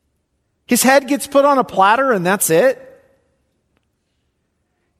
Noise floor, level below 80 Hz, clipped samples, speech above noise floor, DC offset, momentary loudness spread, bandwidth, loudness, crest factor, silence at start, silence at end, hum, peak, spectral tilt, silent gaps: -68 dBFS; -62 dBFS; under 0.1%; 55 dB; under 0.1%; 5 LU; 14.5 kHz; -14 LUFS; 16 dB; 0.7 s; 2.25 s; none; 0 dBFS; -3.5 dB/octave; none